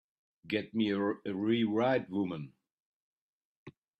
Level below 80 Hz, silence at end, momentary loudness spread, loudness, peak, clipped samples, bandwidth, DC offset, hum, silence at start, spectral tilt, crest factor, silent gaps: -76 dBFS; 0.3 s; 8 LU; -32 LUFS; -18 dBFS; under 0.1%; 6.6 kHz; under 0.1%; none; 0.45 s; -8 dB/octave; 18 dB; 2.72-3.66 s